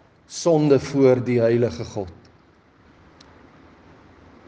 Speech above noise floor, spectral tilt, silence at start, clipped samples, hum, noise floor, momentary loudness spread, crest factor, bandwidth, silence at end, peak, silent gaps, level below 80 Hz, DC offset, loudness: 35 dB; -6.5 dB/octave; 0.3 s; under 0.1%; none; -55 dBFS; 16 LU; 18 dB; 9.4 kHz; 2.35 s; -4 dBFS; none; -58 dBFS; under 0.1%; -20 LUFS